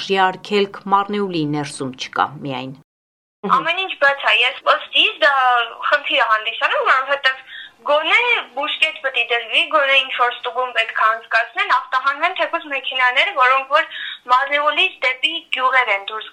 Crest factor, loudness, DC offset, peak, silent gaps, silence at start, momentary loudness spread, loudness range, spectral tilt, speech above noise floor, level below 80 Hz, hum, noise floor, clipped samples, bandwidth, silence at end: 18 dB; -17 LUFS; under 0.1%; 0 dBFS; 2.84-3.43 s; 0 s; 9 LU; 5 LU; -3.5 dB/octave; over 72 dB; -74 dBFS; none; under -90 dBFS; under 0.1%; 11.5 kHz; 0.05 s